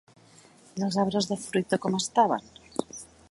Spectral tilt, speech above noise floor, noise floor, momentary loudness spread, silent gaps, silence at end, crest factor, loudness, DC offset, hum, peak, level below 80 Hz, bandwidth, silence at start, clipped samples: -4.5 dB/octave; 29 dB; -55 dBFS; 15 LU; none; 0.25 s; 20 dB; -28 LUFS; under 0.1%; none; -8 dBFS; -66 dBFS; 11.5 kHz; 0.75 s; under 0.1%